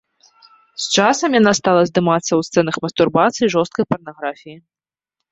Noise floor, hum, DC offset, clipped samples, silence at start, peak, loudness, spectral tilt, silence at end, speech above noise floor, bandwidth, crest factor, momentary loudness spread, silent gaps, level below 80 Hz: -81 dBFS; none; under 0.1%; under 0.1%; 0.8 s; -2 dBFS; -17 LUFS; -4.5 dB/octave; 0.75 s; 65 dB; 8.2 kHz; 16 dB; 13 LU; none; -58 dBFS